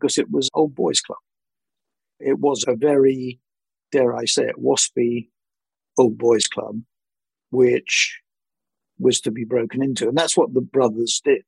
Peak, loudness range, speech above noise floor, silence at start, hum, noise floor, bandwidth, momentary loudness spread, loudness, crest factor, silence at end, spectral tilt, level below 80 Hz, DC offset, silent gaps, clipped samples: -4 dBFS; 2 LU; over 71 dB; 0 s; none; under -90 dBFS; 11.5 kHz; 9 LU; -20 LUFS; 18 dB; 0.05 s; -3.5 dB/octave; -68 dBFS; under 0.1%; none; under 0.1%